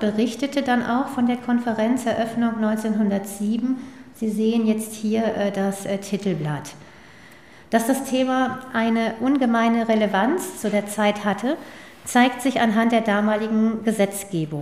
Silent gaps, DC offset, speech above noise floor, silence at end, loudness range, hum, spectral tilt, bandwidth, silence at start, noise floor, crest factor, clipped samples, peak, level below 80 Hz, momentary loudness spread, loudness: none; 0.2%; 26 dB; 0 s; 4 LU; none; -5.5 dB/octave; 15.5 kHz; 0 s; -47 dBFS; 16 dB; under 0.1%; -6 dBFS; -62 dBFS; 8 LU; -22 LUFS